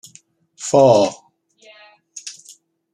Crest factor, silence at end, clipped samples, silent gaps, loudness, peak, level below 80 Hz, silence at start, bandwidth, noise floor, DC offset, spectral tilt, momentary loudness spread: 18 dB; 0.6 s; under 0.1%; none; -15 LUFS; -2 dBFS; -64 dBFS; 0.6 s; 12 kHz; -51 dBFS; under 0.1%; -5 dB/octave; 22 LU